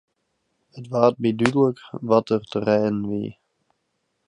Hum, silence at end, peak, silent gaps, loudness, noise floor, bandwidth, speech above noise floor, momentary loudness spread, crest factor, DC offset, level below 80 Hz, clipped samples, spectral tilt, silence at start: none; 0.95 s; 0 dBFS; none; -22 LUFS; -74 dBFS; 11 kHz; 53 dB; 11 LU; 24 dB; under 0.1%; -60 dBFS; under 0.1%; -7 dB/octave; 0.75 s